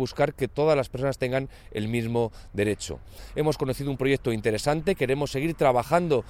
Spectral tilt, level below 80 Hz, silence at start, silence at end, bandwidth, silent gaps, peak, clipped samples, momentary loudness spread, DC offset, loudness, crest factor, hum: -6 dB/octave; -46 dBFS; 0 s; 0 s; 17 kHz; none; -8 dBFS; under 0.1%; 8 LU; under 0.1%; -26 LUFS; 18 dB; none